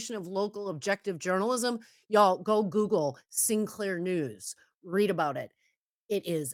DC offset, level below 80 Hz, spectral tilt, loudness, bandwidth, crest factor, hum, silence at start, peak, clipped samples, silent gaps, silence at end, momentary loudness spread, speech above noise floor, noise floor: under 0.1%; -78 dBFS; -4 dB/octave; -29 LUFS; 16.5 kHz; 20 dB; none; 0 s; -10 dBFS; under 0.1%; 4.75-4.81 s, 5.77-6.09 s; 0 s; 13 LU; 38 dB; -67 dBFS